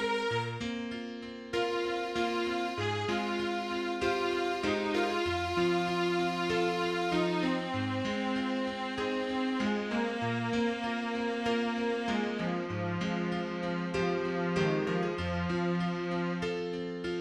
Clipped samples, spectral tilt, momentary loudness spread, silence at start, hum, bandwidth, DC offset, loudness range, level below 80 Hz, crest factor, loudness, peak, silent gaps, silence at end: under 0.1%; -6 dB/octave; 5 LU; 0 s; none; 12.5 kHz; under 0.1%; 2 LU; -58 dBFS; 14 dB; -32 LUFS; -18 dBFS; none; 0 s